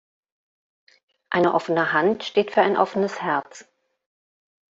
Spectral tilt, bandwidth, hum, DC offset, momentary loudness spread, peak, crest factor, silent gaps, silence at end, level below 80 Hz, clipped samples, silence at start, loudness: -5.5 dB/octave; 7.8 kHz; none; under 0.1%; 6 LU; -4 dBFS; 22 dB; none; 1.1 s; -70 dBFS; under 0.1%; 1.3 s; -22 LUFS